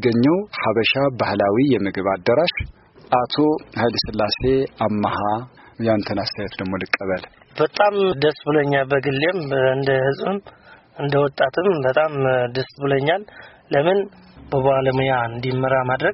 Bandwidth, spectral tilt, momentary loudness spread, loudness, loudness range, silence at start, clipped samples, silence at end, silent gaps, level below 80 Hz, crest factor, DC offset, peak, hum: 6 kHz; -4 dB/octave; 8 LU; -20 LUFS; 3 LU; 0 s; under 0.1%; 0 s; none; -48 dBFS; 16 dB; under 0.1%; -4 dBFS; none